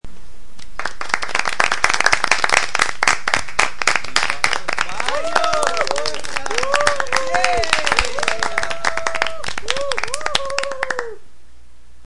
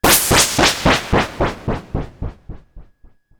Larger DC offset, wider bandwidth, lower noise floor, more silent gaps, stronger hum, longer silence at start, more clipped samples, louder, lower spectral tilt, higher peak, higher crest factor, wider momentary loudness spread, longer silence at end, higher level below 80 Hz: first, 10% vs under 0.1%; second, 11.5 kHz vs over 20 kHz; about the same, -49 dBFS vs -48 dBFS; neither; neither; about the same, 0 s vs 0.05 s; neither; second, -19 LUFS vs -15 LUFS; second, -1 dB/octave vs -2.5 dB/octave; about the same, 0 dBFS vs 0 dBFS; about the same, 22 dB vs 18 dB; second, 8 LU vs 19 LU; second, 0 s vs 0.55 s; second, -42 dBFS vs -30 dBFS